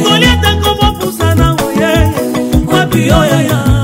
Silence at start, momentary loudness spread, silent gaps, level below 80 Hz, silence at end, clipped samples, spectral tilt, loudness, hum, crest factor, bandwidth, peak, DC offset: 0 s; 5 LU; none; -20 dBFS; 0 s; 0.3%; -5 dB/octave; -10 LUFS; none; 10 dB; 16.5 kHz; 0 dBFS; under 0.1%